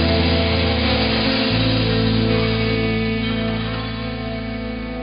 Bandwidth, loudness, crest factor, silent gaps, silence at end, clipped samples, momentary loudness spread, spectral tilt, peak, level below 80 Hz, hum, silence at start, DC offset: 5.4 kHz; -19 LUFS; 14 dB; none; 0 s; under 0.1%; 9 LU; -10 dB/octave; -6 dBFS; -30 dBFS; none; 0 s; under 0.1%